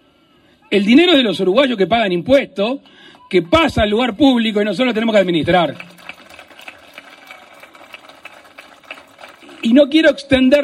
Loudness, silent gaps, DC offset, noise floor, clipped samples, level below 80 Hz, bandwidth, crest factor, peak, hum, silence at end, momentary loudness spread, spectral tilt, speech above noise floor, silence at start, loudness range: -14 LUFS; none; under 0.1%; -53 dBFS; under 0.1%; -44 dBFS; 13.5 kHz; 16 dB; 0 dBFS; none; 0 s; 24 LU; -5.5 dB/octave; 39 dB; 0.7 s; 8 LU